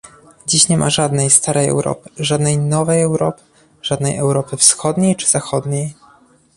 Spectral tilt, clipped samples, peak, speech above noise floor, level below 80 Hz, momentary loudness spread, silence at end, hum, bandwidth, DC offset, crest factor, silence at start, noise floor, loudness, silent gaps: -4 dB/octave; under 0.1%; 0 dBFS; 34 dB; -50 dBFS; 11 LU; 0.65 s; none; 14 kHz; under 0.1%; 16 dB; 0.05 s; -50 dBFS; -15 LUFS; none